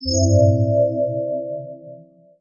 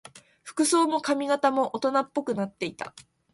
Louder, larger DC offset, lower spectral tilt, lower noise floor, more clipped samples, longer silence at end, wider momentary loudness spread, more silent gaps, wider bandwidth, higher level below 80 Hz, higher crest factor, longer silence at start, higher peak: first, -19 LUFS vs -26 LUFS; neither; first, -7 dB/octave vs -3.5 dB/octave; second, -44 dBFS vs -49 dBFS; neither; about the same, 0.4 s vs 0.3 s; first, 18 LU vs 15 LU; neither; second, 7 kHz vs 12 kHz; first, -44 dBFS vs -72 dBFS; about the same, 16 dB vs 18 dB; second, 0 s vs 0.15 s; first, -4 dBFS vs -10 dBFS